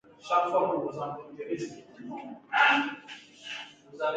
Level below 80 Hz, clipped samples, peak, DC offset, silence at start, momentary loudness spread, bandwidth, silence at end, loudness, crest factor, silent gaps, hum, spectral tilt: -76 dBFS; under 0.1%; -8 dBFS; under 0.1%; 0.25 s; 20 LU; 9.2 kHz; 0 s; -28 LUFS; 22 dB; none; none; -4 dB/octave